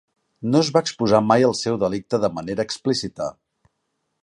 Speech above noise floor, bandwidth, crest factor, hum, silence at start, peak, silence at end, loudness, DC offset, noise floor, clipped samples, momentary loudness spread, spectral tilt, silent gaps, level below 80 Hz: 54 dB; 11.5 kHz; 20 dB; none; 0.4 s; -2 dBFS; 0.9 s; -21 LUFS; under 0.1%; -75 dBFS; under 0.1%; 12 LU; -5.5 dB/octave; none; -56 dBFS